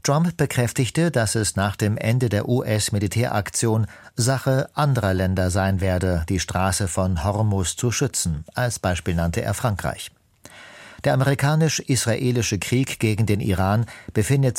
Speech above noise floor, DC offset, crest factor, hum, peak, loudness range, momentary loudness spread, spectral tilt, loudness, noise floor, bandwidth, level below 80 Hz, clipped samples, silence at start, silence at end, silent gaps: 26 dB; under 0.1%; 16 dB; none; -6 dBFS; 3 LU; 5 LU; -5 dB/octave; -22 LUFS; -47 dBFS; 16.5 kHz; -42 dBFS; under 0.1%; 0.05 s; 0 s; none